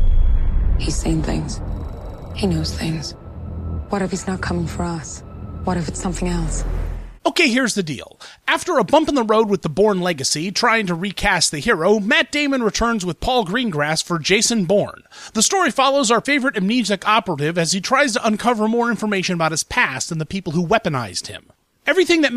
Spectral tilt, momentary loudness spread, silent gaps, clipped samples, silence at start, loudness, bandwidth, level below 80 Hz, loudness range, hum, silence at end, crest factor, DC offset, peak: -4 dB/octave; 13 LU; none; under 0.1%; 0 s; -19 LUFS; 14.5 kHz; -28 dBFS; 7 LU; none; 0 s; 16 dB; under 0.1%; -2 dBFS